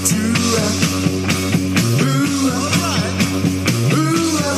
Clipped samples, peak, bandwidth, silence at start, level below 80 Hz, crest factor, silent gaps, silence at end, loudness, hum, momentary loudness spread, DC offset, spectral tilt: under 0.1%; -2 dBFS; 15.5 kHz; 0 s; -46 dBFS; 14 dB; none; 0 s; -16 LUFS; none; 2 LU; under 0.1%; -4.5 dB/octave